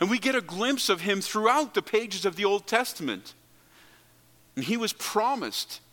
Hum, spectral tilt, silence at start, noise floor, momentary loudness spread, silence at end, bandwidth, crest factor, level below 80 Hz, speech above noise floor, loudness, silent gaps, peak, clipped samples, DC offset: none; -3 dB/octave; 0 s; -59 dBFS; 9 LU; 0.15 s; 17.5 kHz; 22 dB; -74 dBFS; 32 dB; -27 LUFS; none; -6 dBFS; under 0.1%; under 0.1%